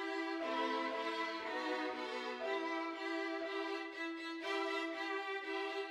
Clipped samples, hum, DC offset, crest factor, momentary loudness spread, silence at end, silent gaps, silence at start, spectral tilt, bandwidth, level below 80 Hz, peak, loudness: under 0.1%; none; under 0.1%; 14 dB; 4 LU; 0 s; none; 0 s; -2 dB/octave; 12.5 kHz; -88 dBFS; -26 dBFS; -40 LUFS